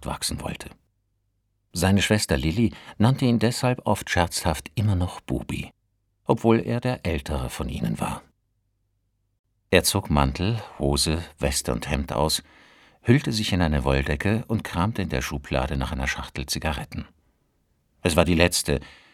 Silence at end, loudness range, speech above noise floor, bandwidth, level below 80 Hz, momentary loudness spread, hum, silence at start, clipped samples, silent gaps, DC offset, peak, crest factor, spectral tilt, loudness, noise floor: 0.2 s; 4 LU; 48 dB; 17 kHz; -36 dBFS; 10 LU; none; 0 s; under 0.1%; 9.39-9.44 s; under 0.1%; 0 dBFS; 24 dB; -5 dB/octave; -24 LUFS; -72 dBFS